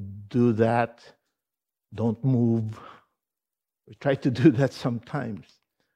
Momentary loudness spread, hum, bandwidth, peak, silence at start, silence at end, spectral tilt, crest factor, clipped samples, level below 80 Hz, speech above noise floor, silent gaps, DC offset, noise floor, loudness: 16 LU; none; 9.8 kHz; -6 dBFS; 0 s; 0.55 s; -8.5 dB/octave; 20 dB; under 0.1%; -66 dBFS; 65 dB; none; under 0.1%; -89 dBFS; -25 LUFS